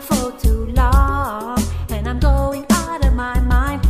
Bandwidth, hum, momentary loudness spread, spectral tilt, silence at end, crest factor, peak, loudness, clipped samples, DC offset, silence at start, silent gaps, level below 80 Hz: 15.5 kHz; none; 6 LU; -6 dB/octave; 0 s; 14 dB; -2 dBFS; -18 LUFS; under 0.1%; under 0.1%; 0 s; none; -18 dBFS